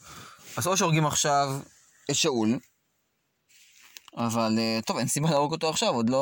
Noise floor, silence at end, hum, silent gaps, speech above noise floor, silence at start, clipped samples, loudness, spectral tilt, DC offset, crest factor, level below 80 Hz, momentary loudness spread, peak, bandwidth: -75 dBFS; 0 s; none; none; 49 dB; 0.05 s; under 0.1%; -26 LUFS; -4 dB/octave; under 0.1%; 16 dB; -64 dBFS; 14 LU; -10 dBFS; 17 kHz